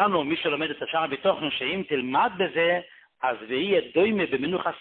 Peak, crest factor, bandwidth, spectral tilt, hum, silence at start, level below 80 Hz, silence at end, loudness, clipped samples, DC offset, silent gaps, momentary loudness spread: -8 dBFS; 16 dB; 4.4 kHz; -9.5 dB/octave; none; 0 s; -64 dBFS; 0 s; -25 LUFS; under 0.1%; under 0.1%; none; 5 LU